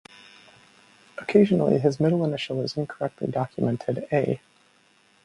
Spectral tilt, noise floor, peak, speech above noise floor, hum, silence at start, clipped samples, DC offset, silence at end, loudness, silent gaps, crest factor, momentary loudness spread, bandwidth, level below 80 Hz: -7.5 dB/octave; -61 dBFS; -4 dBFS; 37 dB; none; 1.2 s; under 0.1%; under 0.1%; 0.85 s; -24 LUFS; none; 22 dB; 10 LU; 11 kHz; -62 dBFS